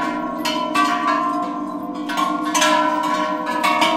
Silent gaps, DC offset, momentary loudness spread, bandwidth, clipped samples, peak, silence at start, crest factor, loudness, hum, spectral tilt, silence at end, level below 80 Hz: none; under 0.1%; 9 LU; 16.5 kHz; under 0.1%; -4 dBFS; 0 s; 16 dB; -20 LUFS; none; -2.5 dB/octave; 0 s; -58 dBFS